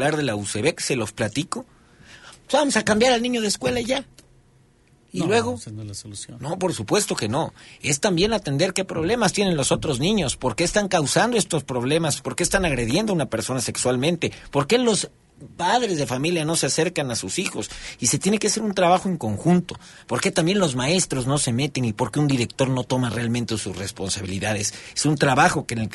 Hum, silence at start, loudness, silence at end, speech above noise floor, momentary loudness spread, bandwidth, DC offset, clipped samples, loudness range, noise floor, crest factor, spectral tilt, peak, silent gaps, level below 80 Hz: none; 0 s; -22 LUFS; 0 s; 34 dB; 8 LU; 12 kHz; under 0.1%; under 0.1%; 3 LU; -57 dBFS; 20 dB; -4 dB/octave; -2 dBFS; none; -48 dBFS